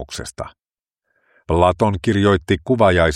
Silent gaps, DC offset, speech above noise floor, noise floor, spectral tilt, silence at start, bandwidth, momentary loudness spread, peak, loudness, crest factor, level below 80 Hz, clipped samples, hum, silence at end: none; under 0.1%; 60 dB; -76 dBFS; -6 dB/octave; 0 s; 12 kHz; 16 LU; 0 dBFS; -17 LUFS; 18 dB; -36 dBFS; under 0.1%; none; 0 s